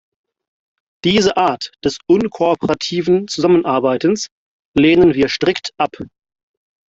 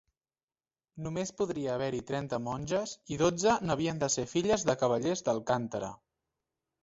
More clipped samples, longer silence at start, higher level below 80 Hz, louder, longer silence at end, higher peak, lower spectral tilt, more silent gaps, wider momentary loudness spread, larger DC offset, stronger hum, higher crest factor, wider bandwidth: neither; about the same, 1.05 s vs 0.95 s; first, -48 dBFS vs -62 dBFS; first, -16 LUFS vs -31 LUFS; about the same, 0.85 s vs 0.9 s; first, -2 dBFS vs -12 dBFS; about the same, -5 dB/octave vs -4.5 dB/octave; first, 4.32-4.74 s vs none; about the same, 9 LU vs 9 LU; neither; neither; second, 14 dB vs 20 dB; about the same, 7.8 kHz vs 8 kHz